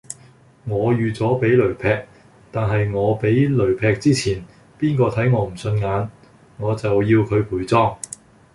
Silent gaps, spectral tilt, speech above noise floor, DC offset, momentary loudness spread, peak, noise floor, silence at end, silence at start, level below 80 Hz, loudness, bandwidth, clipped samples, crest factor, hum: none; -7 dB/octave; 31 dB; under 0.1%; 13 LU; -2 dBFS; -49 dBFS; 0.5 s; 0.1 s; -44 dBFS; -20 LUFS; 11.5 kHz; under 0.1%; 16 dB; none